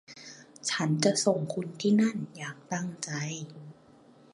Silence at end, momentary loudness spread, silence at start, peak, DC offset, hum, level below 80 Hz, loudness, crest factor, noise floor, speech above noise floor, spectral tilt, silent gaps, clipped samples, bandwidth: 0.6 s; 20 LU; 0.1 s; -10 dBFS; under 0.1%; none; -76 dBFS; -29 LUFS; 20 dB; -57 dBFS; 28 dB; -4.5 dB/octave; none; under 0.1%; 11.5 kHz